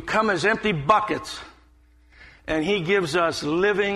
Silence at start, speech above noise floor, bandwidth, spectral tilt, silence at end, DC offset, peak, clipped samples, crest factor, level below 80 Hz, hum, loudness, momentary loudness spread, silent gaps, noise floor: 0 s; 33 dB; 13 kHz; -5 dB/octave; 0 s; under 0.1%; -4 dBFS; under 0.1%; 20 dB; -50 dBFS; none; -22 LUFS; 10 LU; none; -55 dBFS